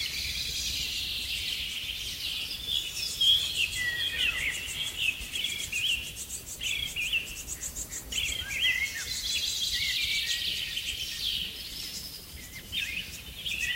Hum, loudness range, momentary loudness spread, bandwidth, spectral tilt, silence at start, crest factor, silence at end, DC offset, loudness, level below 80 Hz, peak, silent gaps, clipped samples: none; 4 LU; 10 LU; 16 kHz; 0.5 dB/octave; 0 s; 18 dB; 0 s; under 0.1%; -29 LUFS; -50 dBFS; -14 dBFS; none; under 0.1%